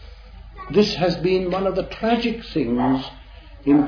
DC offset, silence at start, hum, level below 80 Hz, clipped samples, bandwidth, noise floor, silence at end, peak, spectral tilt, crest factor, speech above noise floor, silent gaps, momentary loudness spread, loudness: under 0.1%; 0 s; none; -42 dBFS; under 0.1%; 5.4 kHz; -40 dBFS; 0 s; -6 dBFS; -7 dB/octave; 16 dB; 19 dB; none; 6 LU; -21 LUFS